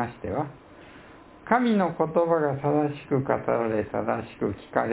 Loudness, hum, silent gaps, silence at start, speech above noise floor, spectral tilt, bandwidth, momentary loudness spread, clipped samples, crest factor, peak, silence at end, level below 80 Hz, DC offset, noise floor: -26 LUFS; none; none; 0 s; 23 dB; -11.5 dB/octave; 4 kHz; 8 LU; under 0.1%; 20 dB; -6 dBFS; 0 s; -54 dBFS; under 0.1%; -48 dBFS